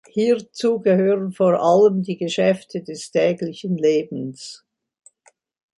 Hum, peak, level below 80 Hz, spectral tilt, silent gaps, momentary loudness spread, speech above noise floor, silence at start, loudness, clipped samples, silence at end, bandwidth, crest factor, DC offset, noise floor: none; -4 dBFS; -68 dBFS; -6 dB/octave; none; 14 LU; 40 dB; 0.15 s; -20 LUFS; under 0.1%; 1.25 s; 11.5 kHz; 16 dB; under 0.1%; -59 dBFS